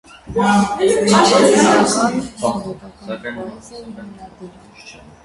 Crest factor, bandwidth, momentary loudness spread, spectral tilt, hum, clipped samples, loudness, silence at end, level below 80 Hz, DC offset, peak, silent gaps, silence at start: 18 dB; 11.5 kHz; 23 LU; -4 dB/octave; none; under 0.1%; -14 LUFS; 0.35 s; -48 dBFS; under 0.1%; 0 dBFS; none; 0.25 s